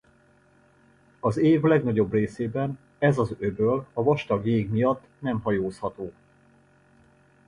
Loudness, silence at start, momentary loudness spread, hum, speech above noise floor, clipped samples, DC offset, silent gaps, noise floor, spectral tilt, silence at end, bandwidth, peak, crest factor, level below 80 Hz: -25 LUFS; 1.25 s; 10 LU; none; 36 dB; under 0.1%; under 0.1%; none; -60 dBFS; -8.5 dB/octave; 1.35 s; 10.5 kHz; -8 dBFS; 18 dB; -56 dBFS